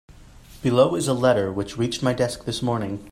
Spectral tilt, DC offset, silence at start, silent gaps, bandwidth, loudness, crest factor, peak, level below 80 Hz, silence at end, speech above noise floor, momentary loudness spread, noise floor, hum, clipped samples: -5.5 dB/octave; under 0.1%; 0.1 s; none; 15.5 kHz; -23 LUFS; 18 dB; -4 dBFS; -50 dBFS; 0 s; 24 dB; 8 LU; -46 dBFS; none; under 0.1%